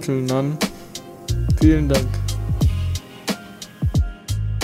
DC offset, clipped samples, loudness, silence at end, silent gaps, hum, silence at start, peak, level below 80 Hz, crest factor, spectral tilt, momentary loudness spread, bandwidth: under 0.1%; under 0.1%; -21 LUFS; 0 s; none; none; 0 s; -2 dBFS; -26 dBFS; 18 dB; -6 dB/octave; 13 LU; 16 kHz